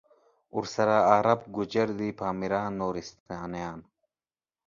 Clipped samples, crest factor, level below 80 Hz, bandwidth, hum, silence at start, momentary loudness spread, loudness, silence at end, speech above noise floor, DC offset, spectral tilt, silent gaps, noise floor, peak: under 0.1%; 24 dB; -60 dBFS; 7.4 kHz; none; 0.55 s; 17 LU; -28 LUFS; 0.85 s; over 63 dB; under 0.1%; -6 dB/octave; 3.20-3.26 s; under -90 dBFS; -6 dBFS